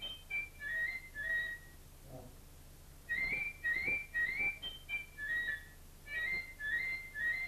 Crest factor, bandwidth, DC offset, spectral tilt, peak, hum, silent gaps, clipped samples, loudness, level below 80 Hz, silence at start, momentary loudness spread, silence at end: 14 dB; 14 kHz; under 0.1%; -2.5 dB/octave; -26 dBFS; none; none; under 0.1%; -37 LUFS; -56 dBFS; 0 s; 22 LU; 0 s